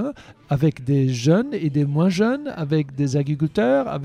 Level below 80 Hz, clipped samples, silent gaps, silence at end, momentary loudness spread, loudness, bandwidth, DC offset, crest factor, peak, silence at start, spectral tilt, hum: -54 dBFS; under 0.1%; none; 0 s; 4 LU; -21 LUFS; 10 kHz; under 0.1%; 16 dB; -4 dBFS; 0 s; -7.5 dB/octave; none